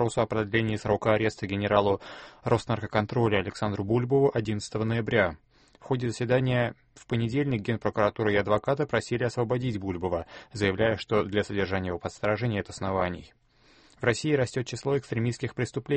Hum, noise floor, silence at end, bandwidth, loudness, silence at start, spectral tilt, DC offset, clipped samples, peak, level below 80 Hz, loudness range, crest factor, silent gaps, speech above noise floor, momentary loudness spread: none; -59 dBFS; 0 s; 8.8 kHz; -28 LUFS; 0 s; -6.5 dB/octave; under 0.1%; under 0.1%; -6 dBFS; -54 dBFS; 3 LU; 20 dB; none; 32 dB; 7 LU